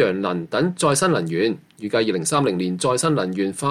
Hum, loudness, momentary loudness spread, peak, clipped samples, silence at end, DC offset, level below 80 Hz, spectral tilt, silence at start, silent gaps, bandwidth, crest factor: none; -21 LUFS; 5 LU; -6 dBFS; under 0.1%; 0 s; under 0.1%; -60 dBFS; -4.5 dB/octave; 0 s; none; 15 kHz; 14 dB